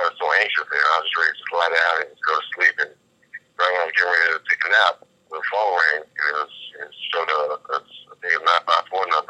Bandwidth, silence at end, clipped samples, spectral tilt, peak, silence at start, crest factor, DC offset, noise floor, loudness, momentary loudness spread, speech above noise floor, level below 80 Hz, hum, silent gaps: 9.8 kHz; 0.05 s; under 0.1%; 0 dB/octave; -4 dBFS; 0 s; 18 dB; under 0.1%; -44 dBFS; -20 LUFS; 11 LU; 23 dB; -82 dBFS; none; none